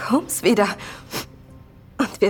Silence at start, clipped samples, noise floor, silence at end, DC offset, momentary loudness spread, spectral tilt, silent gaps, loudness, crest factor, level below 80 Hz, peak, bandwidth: 0 s; under 0.1%; -45 dBFS; 0 s; under 0.1%; 18 LU; -4 dB/octave; none; -22 LUFS; 18 dB; -52 dBFS; -4 dBFS; 19 kHz